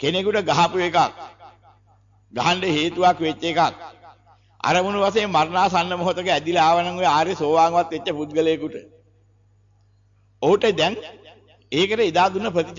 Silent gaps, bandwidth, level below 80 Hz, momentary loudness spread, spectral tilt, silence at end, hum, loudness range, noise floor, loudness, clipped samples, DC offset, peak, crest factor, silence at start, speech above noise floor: none; 7.6 kHz; -56 dBFS; 9 LU; -4.5 dB/octave; 0 s; 50 Hz at -50 dBFS; 5 LU; -58 dBFS; -20 LUFS; under 0.1%; under 0.1%; -6 dBFS; 14 dB; 0 s; 38 dB